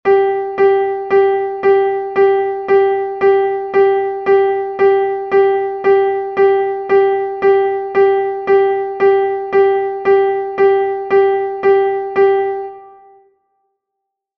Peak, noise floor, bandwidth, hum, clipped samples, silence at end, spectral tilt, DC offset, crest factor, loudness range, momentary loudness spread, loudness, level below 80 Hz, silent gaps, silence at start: -2 dBFS; -77 dBFS; 4.7 kHz; none; under 0.1%; 1.5 s; -7 dB/octave; under 0.1%; 12 dB; 1 LU; 4 LU; -14 LUFS; -56 dBFS; none; 0.05 s